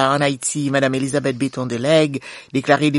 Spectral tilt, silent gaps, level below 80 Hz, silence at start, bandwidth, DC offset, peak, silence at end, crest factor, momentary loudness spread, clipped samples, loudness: -4.5 dB/octave; none; -58 dBFS; 0 s; 11.5 kHz; under 0.1%; 0 dBFS; 0 s; 18 dB; 7 LU; under 0.1%; -19 LUFS